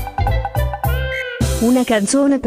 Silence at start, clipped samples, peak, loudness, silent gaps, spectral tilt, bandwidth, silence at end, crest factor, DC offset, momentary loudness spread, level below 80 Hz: 0 s; under 0.1%; -4 dBFS; -18 LUFS; none; -5.5 dB/octave; 16 kHz; 0 s; 12 dB; under 0.1%; 6 LU; -24 dBFS